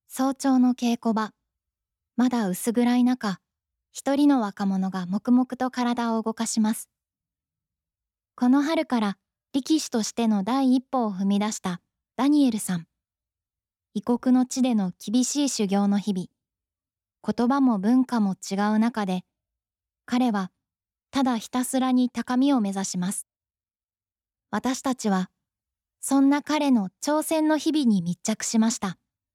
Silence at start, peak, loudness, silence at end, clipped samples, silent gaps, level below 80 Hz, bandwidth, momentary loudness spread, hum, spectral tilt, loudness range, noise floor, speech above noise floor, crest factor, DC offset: 0.1 s; -12 dBFS; -24 LUFS; 0.4 s; under 0.1%; none; -72 dBFS; 15 kHz; 11 LU; none; -5 dB/octave; 3 LU; under -90 dBFS; over 67 dB; 14 dB; under 0.1%